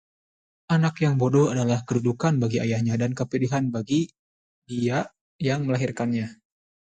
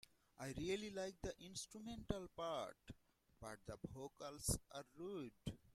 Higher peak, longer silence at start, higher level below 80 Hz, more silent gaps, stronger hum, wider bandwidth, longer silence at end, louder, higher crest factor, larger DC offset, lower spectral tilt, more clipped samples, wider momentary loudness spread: first, -8 dBFS vs -24 dBFS; first, 0.7 s vs 0.4 s; about the same, -60 dBFS vs -64 dBFS; first, 4.19-4.62 s, 5.21-5.39 s vs none; neither; second, 9 kHz vs 16 kHz; first, 0.5 s vs 0 s; first, -25 LUFS vs -49 LUFS; second, 16 dB vs 26 dB; neither; first, -7 dB/octave vs -4 dB/octave; neither; second, 8 LU vs 12 LU